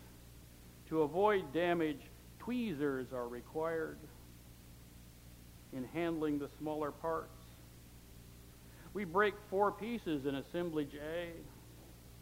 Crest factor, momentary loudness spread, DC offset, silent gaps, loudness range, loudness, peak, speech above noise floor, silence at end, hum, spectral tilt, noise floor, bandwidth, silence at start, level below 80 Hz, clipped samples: 20 dB; 23 LU; under 0.1%; none; 6 LU; -38 LUFS; -18 dBFS; 19 dB; 0 s; none; -6 dB/octave; -57 dBFS; 16.5 kHz; 0 s; -60 dBFS; under 0.1%